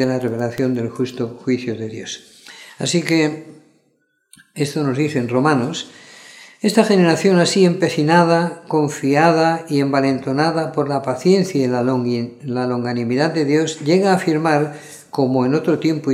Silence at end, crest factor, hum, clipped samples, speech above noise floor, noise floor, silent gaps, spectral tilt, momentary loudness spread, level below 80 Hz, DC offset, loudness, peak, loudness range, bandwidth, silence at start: 0 s; 18 dB; none; under 0.1%; 47 dB; -64 dBFS; none; -5.5 dB/octave; 11 LU; -66 dBFS; under 0.1%; -18 LUFS; 0 dBFS; 7 LU; 15 kHz; 0 s